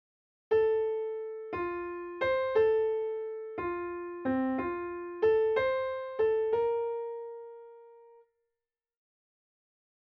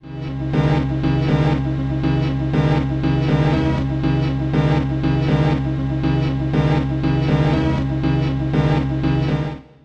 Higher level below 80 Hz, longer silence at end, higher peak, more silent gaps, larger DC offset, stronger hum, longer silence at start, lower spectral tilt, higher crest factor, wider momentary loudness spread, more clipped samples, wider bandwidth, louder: second, -64 dBFS vs -30 dBFS; first, 2 s vs 0.2 s; second, -16 dBFS vs -4 dBFS; neither; neither; neither; first, 0.5 s vs 0.05 s; second, -4 dB/octave vs -8.5 dB/octave; about the same, 16 dB vs 14 dB; first, 12 LU vs 4 LU; neither; second, 5.4 kHz vs 6.8 kHz; second, -31 LUFS vs -19 LUFS